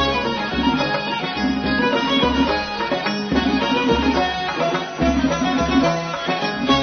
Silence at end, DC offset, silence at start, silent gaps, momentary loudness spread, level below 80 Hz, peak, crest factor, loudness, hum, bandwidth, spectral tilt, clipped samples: 0 s; under 0.1%; 0 s; none; 4 LU; -36 dBFS; -4 dBFS; 14 dB; -19 LUFS; none; 6.6 kHz; -5 dB/octave; under 0.1%